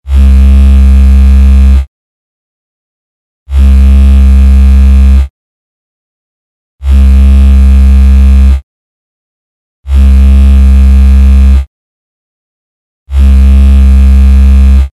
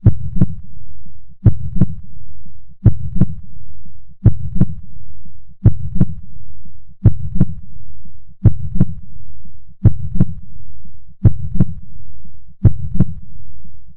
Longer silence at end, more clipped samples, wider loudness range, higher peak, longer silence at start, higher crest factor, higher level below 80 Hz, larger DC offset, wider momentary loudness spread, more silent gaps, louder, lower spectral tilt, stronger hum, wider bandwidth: about the same, 0.05 s vs 0 s; first, 10% vs under 0.1%; about the same, 1 LU vs 1 LU; about the same, 0 dBFS vs 0 dBFS; about the same, 0.05 s vs 0 s; second, 4 dB vs 12 dB; first, -4 dBFS vs -26 dBFS; first, 2% vs under 0.1%; second, 6 LU vs 19 LU; first, 1.87-3.46 s, 5.30-6.78 s, 8.63-9.83 s, 11.67-13.06 s vs none; first, -5 LUFS vs -18 LUFS; second, -8 dB/octave vs -13.5 dB/octave; neither; first, 4.3 kHz vs 2.1 kHz